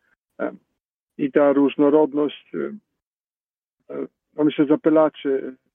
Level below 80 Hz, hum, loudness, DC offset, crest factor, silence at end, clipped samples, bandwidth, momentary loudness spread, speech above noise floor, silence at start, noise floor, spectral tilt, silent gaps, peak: -76 dBFS; none; -20 LUFS; under 0.1%; 18 dB; 0.2 s; under 0.1%; 3.7 kHz; 16 LU; over 70 dB; 0.4 s; under -90 dBFS; -9.5 dB/octave; 0.85-1.07 s, 3.02-3.78 s; -4 dBFS